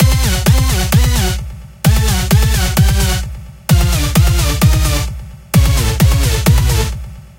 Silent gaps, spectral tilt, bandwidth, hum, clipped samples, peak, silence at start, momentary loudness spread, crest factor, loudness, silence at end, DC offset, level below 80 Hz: none; -4.5 dB/octave; 17.5 kHz; none; under 0.1%; 0 dBFS; 0 s; 9 LU; 12 dB; -13 LUFS; 0.15 s; under 0.1%; -16 dBFS